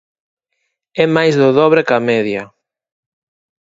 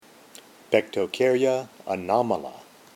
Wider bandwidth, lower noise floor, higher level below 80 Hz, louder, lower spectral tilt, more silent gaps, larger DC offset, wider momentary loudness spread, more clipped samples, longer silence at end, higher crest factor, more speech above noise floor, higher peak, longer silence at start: second, 7.8 kHz vs 16.5 kHz; first, -71 dBFS vs -50 dBFS; first, -60 dBFS vs -70 dBFS; first, -13 LUFS vs -25 LUFS; first, -6.5 dB/octave vs -5 dB/octave; neither; neither; about the same, 11 LU vs 10 LU; neither; first, 1.15 s vs 0.35 s; about the same, 16 dB vs 20 dB; first, 59 dB vs 26 dB; first, 0 dBFS vs -6 dBFS; first, 0.95 s vs 0.7 s